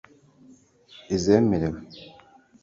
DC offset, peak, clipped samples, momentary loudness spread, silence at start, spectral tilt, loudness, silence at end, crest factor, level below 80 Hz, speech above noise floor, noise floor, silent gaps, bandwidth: under 0.1%; -6 dBFS; under 0.1%; 24 LU; 1.1 s; -6.5 dB/octave; -23 LUFS; 0.55 s; 20 dB; -50 dBFS; 31 dB; -54 dBFS; none; 7.8 kHz